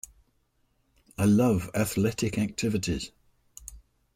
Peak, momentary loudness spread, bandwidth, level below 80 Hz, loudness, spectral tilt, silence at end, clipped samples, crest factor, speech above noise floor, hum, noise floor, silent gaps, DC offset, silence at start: -12 dBFS; 23 LU; 16 kHz; -52 dBFS; -27 LUFS; -5.5 dB/octave; 0.35 s; under 0.1%; 16 dB; 45 dB; none; -71 dBFS; none; under 0.1%; 1.2 s